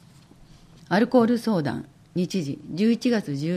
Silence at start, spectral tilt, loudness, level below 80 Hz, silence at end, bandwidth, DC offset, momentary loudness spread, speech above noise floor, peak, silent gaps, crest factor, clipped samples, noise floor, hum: 0.9 s; -6.5 dB/octave; -24 LUFS; -60 dBFS; 0 s; 13.5 kHz; under 0.1%; 11 LU; 28 dB; -8 dBFS; none; 16 dB; under 0.1%; -51 dBFS; none